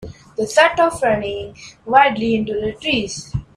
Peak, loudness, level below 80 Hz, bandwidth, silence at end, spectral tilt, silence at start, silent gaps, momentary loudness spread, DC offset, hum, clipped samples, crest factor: 0 dBFS; -17 LUFS; -44 dBFS; 14 kHz; 0.1 s; -4 dB/octave; 0 s; none; 15 LU; under 0.1%; none; under 0.1%; 18 dB